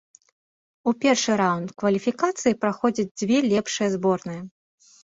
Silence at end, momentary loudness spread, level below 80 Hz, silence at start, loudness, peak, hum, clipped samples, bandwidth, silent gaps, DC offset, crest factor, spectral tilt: 0.55 s; 8 LU; -64 dBFS; 0.85 s; -23 LUFS; -6 dBFS; none; under 0.1%; 8 kHz; 3.11-3.15 s; under 0.1%; 18 dB; -4.5 dB/octave